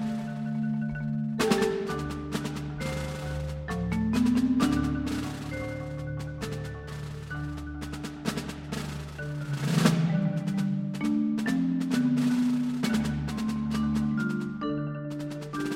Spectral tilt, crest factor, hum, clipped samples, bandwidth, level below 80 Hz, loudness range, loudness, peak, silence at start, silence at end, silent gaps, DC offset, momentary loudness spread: -6.5 dB/octave; 22 dB; none; under 0.1%; 16 kHz; -46 dBFS; 8 LU; -30 LUFS; -8 dBFS; 0 s; 0 s; none; under 0.1%; 11 LU